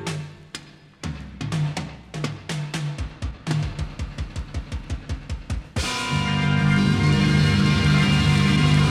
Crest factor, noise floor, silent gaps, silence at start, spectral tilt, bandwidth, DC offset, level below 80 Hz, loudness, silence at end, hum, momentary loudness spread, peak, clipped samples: 16 dB; -41 dBFS; none; 0 s; -5.5 dB/octave; 12 kHz; under 0.1%; -34 dBFS; -23 LUFS; 0 s; none; 16 LU; -6 dBFS; under 0.1%